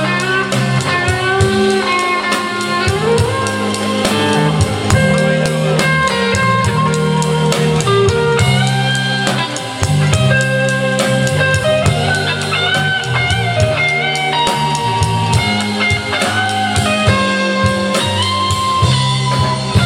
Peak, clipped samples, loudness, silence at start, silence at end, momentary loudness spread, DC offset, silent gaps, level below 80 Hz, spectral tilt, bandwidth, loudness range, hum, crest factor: 0 dBFS; under 0.1%; -14 LUFS; 0 s; 0 s; 3 LU; under 0.1%; none; -36 dBFS; -4.5 dB/octave; 16 kHz; 1 LU; none; 14 dB